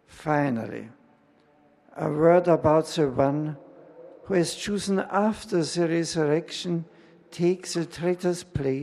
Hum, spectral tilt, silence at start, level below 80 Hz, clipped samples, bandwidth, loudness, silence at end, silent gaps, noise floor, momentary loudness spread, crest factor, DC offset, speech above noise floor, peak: none; -6 dB/octave; 0.15 s; -56 dBFS; under 0.1%; 13 kHz; -25 LUFS; 0 s; none; -60 dBFS; 12 LU; 20 dB; under 0.1%; 36 dB; -6 dBFS